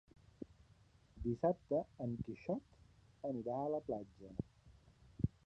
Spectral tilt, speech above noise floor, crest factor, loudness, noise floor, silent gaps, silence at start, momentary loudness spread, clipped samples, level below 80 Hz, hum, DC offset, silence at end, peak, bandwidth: -10 dB/octave; 27 dB; 22 dB; -43 LUFS; -68 dBFS; none; 0.4 s; 18 LU; under 0.1%; -60 dBFS; none; under 0.1%; 0.15 s; -22 dBFS; 8.6 kHz